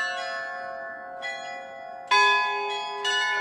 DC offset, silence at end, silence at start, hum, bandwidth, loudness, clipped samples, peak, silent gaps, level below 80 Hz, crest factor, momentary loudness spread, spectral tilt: under 0.1%; 0 s; 0 s; none; 12.5 kHz; -25 LUFS; under 0.1%; -8 dBFS; none; -78 dBFS; 18 dB; 17 LU; 0.5 dB/octave